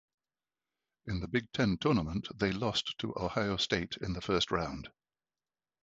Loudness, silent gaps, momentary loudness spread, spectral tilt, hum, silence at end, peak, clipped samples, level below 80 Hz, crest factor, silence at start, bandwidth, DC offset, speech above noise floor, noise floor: -33 LUFS; none; 9 LU; -5 dB/octave; none; 0.95 s; -12 dBFS; under 0.1%; -52 dBFS; 22 dB; 1.05 s; 8.2 kHz; under 0.1%; over 57 dB; under -90 dBFS